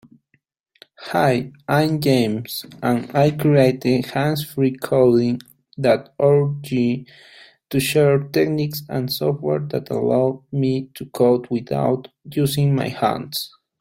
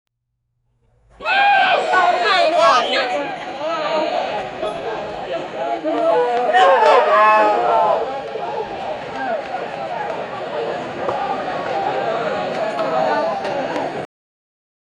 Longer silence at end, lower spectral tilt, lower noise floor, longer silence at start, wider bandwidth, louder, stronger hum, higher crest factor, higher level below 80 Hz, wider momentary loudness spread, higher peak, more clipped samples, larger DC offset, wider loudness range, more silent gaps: second, 0.35 s vs 0.95 s; first, -6.5 dB/octave vs -3.5 dB/octave; second, -66 dBFS vs -73 dBFS; second, 1 s vs 1.2 s; first, 16.5 kHz vs 11 kHz; about the same, -20 LUFS vs -18 LUFS; neither; about the same, 16 dB vs 18 dB; about the same, -56 dBFS vs -58 dBFS; second, 10 LU vs 13 LU; about the same, -2 dBFS vs 0 dBFS; neither; neither; second, 3 LU vs 8 LU; neither